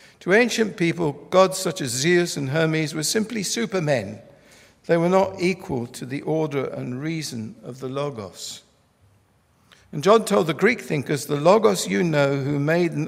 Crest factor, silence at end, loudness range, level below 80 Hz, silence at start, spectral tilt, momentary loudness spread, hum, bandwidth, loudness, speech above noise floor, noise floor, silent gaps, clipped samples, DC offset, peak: 20 dB; 0 s; 9 LU; -62 dBFS; 0.2 s; -5 dB/octave; 15 LU; none; 16 kHz; -22 LUFS; 39 dB; -61 dBFS; none; under 0.1%; under 0.1%; -2 dBFS